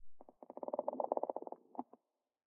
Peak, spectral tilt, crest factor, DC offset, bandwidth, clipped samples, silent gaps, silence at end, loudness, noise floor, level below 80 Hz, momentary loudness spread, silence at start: -18 dBFS; -3.5 dB/octave; 26 dB; under 0.1%; 2.4 kHz; under 0.1%; none; 0.75 s; -43 LUFS; -69 dBFS; -80 dBFS; 17 LU; 0 s